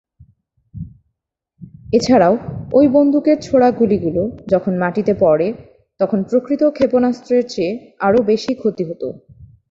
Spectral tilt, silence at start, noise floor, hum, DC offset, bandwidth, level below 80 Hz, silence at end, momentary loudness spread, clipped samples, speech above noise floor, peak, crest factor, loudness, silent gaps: -7 dB/octave; 0.75 s; -76 dBFS; none; under 0.1%; 7.8 kHz; -48 dBFS; 0.25 s; 11 LU; under 0.1%; 61 dB; -2 dBFS; 14 dB; -16 LUFS; none